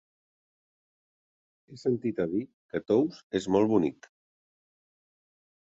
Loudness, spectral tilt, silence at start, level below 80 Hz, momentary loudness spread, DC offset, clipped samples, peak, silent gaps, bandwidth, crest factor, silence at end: -29 LUFS; -7 dB/octave; 1.7 s; -66 dBFS; 10 LU; under 0.1%; under 0.1%; -12 dBFS; 2.54-2.69 s, 3.23-3.30 s; 7.8 kHz; 20 dB; 1.85 s